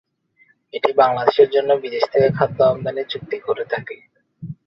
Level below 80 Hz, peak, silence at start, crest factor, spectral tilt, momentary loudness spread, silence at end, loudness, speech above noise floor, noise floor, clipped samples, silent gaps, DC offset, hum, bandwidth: -58 dBFS; 0 dBFS; 0.75 s; 18 dB; -7.5 dB/octave; 18 LU; 0.15 s; -18 LUFS; 40 dB; -58 dBFS; under 0.1%; none; under 0.1%; none; 6 kHz